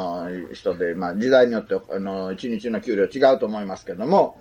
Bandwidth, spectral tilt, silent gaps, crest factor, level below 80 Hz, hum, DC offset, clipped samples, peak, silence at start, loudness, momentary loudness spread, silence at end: 9.4 kHz; -6.5 dB/octave; none; 18 dB; -60 dBFS; none; under 0.1%; under 0.1%; -4 dBFS; 0 s; -22 LUFS; 12 LU; 0.05 s